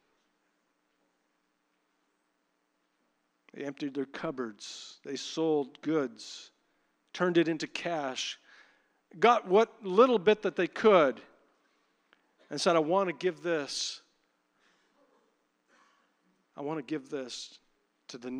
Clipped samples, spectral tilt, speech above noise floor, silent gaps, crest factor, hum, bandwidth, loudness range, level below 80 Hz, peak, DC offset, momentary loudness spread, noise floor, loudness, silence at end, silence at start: under 0.1%; -4.5 dB/octave; 48 dB; none; 24 dB; none; 10.5 kHz; 16 LU; -82 dBFS; -8 dBFS; under 0.1%; 20 LU; -77 dBFS; -29 LUFS; 0 s; 3.55 s